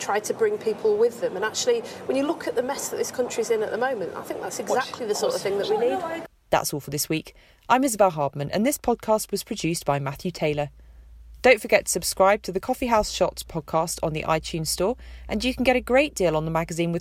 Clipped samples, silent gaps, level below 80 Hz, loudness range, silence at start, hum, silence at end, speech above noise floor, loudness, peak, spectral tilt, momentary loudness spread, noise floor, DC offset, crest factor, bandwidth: under 0.1%; none; -48 dBFS; 4 LU; 0 s; none; 0 s; 22 dB; -24 LUFS; -2 dBFS; -4 dB/octave; 8 LU; -46 dBFS; under 0.1%; 22 dB; 16 kHz